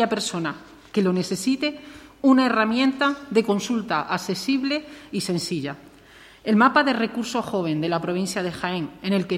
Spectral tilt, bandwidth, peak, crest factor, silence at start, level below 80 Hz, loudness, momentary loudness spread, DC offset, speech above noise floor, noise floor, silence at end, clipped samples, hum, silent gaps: -5 dB/octave; 15.5 kHz; -4 dBFS; 20 dB; 0 s; -60 dBFS; -23 LUFS; 11 LU; under 0.1%; 26 dB; -49 dBFS; 0 s; under 0.1%; none; none